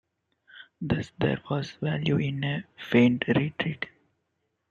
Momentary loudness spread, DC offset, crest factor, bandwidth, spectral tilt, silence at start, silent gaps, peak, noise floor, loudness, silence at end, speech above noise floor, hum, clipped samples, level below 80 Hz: 12 LU; under 0.1%; 20 dB; 7.4 kHz; -7.5 dB/octave; 0.55 s; none; -8 dBFS; -78 dBFS; -27 LUFS; 0.85 s; 51 dB; none; under 0.1%; -58 dBFS